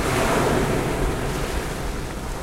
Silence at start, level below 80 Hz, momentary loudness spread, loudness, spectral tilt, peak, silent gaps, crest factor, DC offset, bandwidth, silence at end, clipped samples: 0 s; -30 dBFS; 10 LU; -24 LUFS; -5 dB/octave; -8 dBFS; none; 16 dB; under 0.1%; 16 kHz; 0 s; under 0.1%